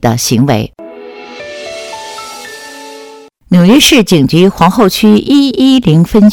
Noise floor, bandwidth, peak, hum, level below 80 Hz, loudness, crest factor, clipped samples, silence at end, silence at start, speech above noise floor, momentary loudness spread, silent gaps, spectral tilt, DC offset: -34 dBFS; 19 kHz; 0 dBFS; none; -36 dBFS; -7 LUFS; 10 dB; 1%; 0 s; 0.05 s; 27 dB; 22 LU; none; -5 dB/octave; under 0.1%